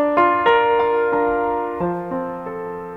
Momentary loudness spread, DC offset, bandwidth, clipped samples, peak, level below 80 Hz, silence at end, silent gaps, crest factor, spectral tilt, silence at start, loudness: 13 LU; 0.1%; 5.2 kHz; under 0.1%; -4 dBFS; -50 dBFS; 0 s; none; 16 dB; -7.5 dB/octave; 0 s; -19 LUFS